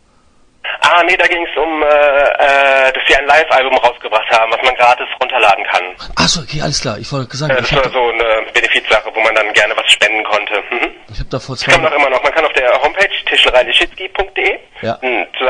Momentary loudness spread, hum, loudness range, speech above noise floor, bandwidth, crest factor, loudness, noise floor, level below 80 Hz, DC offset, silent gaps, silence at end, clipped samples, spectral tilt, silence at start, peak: 10 LU; none; 3 LU; 36 dB; 12 kHz; 12 dB; -11 LUFS; -49 dBFS; -36 dBFS; under 0.1%; none; 0 s; 0.2%; -3 dB/octave; 0.65 s; 0 dBFS